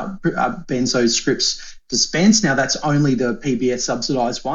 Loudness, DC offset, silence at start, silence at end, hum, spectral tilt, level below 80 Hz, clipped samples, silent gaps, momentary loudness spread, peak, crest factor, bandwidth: -18 LUFS; under 0.1%; 0 s; 0 s; none; -3.5 dB/octave; -44 dBFS; under 0.1%; none; 8 LU; -2 dBFS; 16 dB; 8 kHz